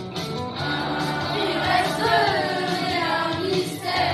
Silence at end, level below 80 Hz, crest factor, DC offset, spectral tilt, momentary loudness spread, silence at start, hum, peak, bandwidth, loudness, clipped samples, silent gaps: 0 s; -52 dBFS; 16 dB; under 0.1%; -4.5 dB/octave; 7 LU; 0 s; none; -8 dBFS; 13.5 kHz; -23 LUFS; under 0.1%; none